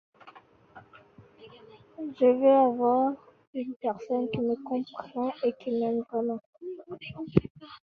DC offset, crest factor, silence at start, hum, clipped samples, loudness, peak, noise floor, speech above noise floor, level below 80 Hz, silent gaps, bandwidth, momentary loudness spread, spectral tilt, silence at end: under 0.1%; 24 dB; 0.25 s; none; under 0.1%; -28 LUFS; -4 dBFS; -55 dBFS; 28 dB; -60 dBFS; 3.47-3.53 s, 3.76-3.80 s, 6.46-6.53 s, 7.50-7.55 s; 6 kHz; 19 LU; -9.5 dB/octave; 0.05 s